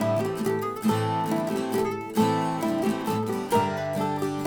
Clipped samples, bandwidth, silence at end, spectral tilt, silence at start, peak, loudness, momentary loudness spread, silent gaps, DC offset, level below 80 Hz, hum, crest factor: under 0.1%; over 20 kHz; 0 s; -6 dB/octave; 0 s; -10 dBFS; -26 LUFS; 3 LU; none; under 0.1%; -62 dBFS; none; 16 dB